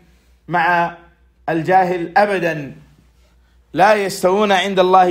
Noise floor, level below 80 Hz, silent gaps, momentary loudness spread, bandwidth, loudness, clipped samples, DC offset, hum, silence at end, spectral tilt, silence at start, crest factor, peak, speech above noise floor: -52 dBFS; -54 dBFS; none; 11 LU; 16 kHz; -16 LUFS; under 0.1%; under 0.1%; none; 0 s; -5 dB/octave; 0.5 s; 16 dB; 0 dBFS; 38 dB